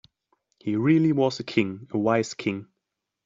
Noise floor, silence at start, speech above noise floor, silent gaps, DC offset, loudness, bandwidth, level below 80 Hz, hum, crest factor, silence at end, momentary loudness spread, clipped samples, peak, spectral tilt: -83 dBFS; 0.65 s; 59 dB; none; under 0.1%; -24 LUFS; 7.6 kHz; -68 dBFS; none; 18 dB; 0.65 s; 10 LU; under 0.1%; -8 dBFS; -6.5 dB/octave